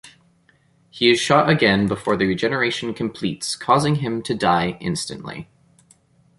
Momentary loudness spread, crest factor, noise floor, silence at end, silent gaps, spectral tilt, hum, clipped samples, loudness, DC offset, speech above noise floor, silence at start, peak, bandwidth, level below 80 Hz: 11 LU; 20 dB; -59 dBFS; 0.95 s; none; -5 dB/octave; none; under 0.1%; -20 LUFS; under 0.1%; 39 dB; 0.05 s; -2 dBFS; 11.5 kHz; -52 dBFS